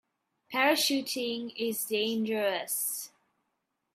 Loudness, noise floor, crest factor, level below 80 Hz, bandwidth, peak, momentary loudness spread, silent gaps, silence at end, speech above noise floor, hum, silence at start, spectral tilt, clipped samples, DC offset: -30 LUFS; -81 dBFS; 20 dB; -84 dBFS; 16 kHz; -12 dBFS; 9 LU; none; 0.85 s; 51 dB; none; 0.5 s; -2 dB/octave; under 0.1%; under 0.1%